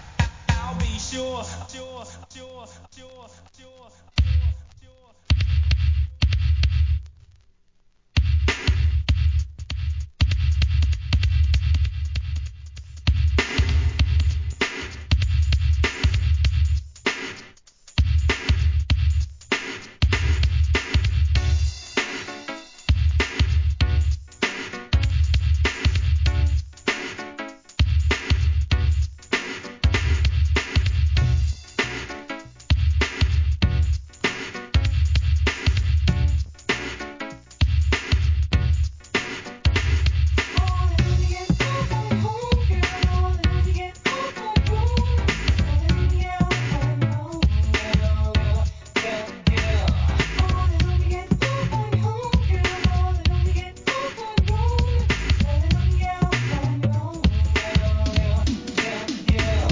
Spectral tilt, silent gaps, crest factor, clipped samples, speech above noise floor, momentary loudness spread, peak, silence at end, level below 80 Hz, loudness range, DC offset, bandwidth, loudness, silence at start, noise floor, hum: -5.5 dB/octave; none; 16 dB; under 0.1%; 34 dB; 8 LU; -6 dBFS; 0 s; -24 dBFS; 2 LU; under 0.1%; 7.6 kHz; -23 LUFS; 0 s; -60 dBFS; none